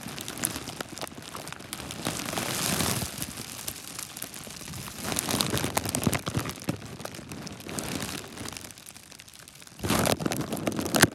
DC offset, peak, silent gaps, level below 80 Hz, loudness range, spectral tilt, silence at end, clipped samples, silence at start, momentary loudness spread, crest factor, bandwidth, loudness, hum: under 0.1%; 0 dBFS; none; -52 dBFS; 4 LU; -3 dB/octave; 0 s; under 0.1%; 0 s; 13 LU; 32 dB; 17 kHz; -31 LUFS; none